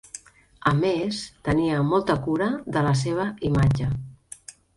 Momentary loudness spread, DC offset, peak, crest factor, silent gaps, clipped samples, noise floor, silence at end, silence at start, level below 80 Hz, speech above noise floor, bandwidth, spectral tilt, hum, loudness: 19 LU; under 0.1%; -6 dBFS; 18 dB; none; under 0.1%; -46 dBFS; 0.25 s; 0.15 s; -44 dBFS; 23 dB; 11.5 kHz; -6.5 dB/octave; none; -24 LUFS